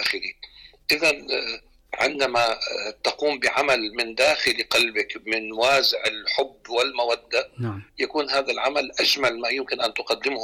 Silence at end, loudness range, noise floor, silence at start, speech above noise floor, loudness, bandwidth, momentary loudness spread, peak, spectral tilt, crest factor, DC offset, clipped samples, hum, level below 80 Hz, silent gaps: 0 s; 3 LU; -46 dBFS; 0 s; 23 dB; -23 LUFS; 17.5 kHz; 10 LU; -10 dBFS; -2.5 dB/octave; 14 dB; under 0.1%; under 0.1%; none; -60 dBFS; none